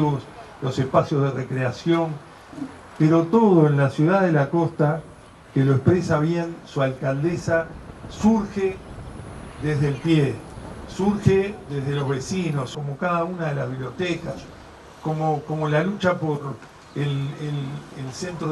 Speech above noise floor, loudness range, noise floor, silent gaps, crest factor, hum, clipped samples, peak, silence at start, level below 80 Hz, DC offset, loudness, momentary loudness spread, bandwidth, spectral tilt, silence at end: 22 dB; 6 LU; -43 dBFS; none; 20 dB; none; under 0.1%; -4 dBFS; 0 s; -48 dBFS; under 0.1%; -23 LUFS; 17 LU; 11.5 kHz; -7.5 dB/octave; 0 s